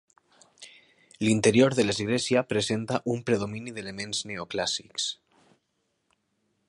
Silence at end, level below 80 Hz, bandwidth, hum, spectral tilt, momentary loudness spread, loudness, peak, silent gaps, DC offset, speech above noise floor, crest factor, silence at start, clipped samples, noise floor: 1.55 s; -62 dBFS; 11.5 kHz; none; -4.5 dB/octave; 13 LU; -27 LUFS; -8 dBFS; none; under 0.1%; 50 dB; 20 dB; 0.6 s; under 0.1%; -76 dBFS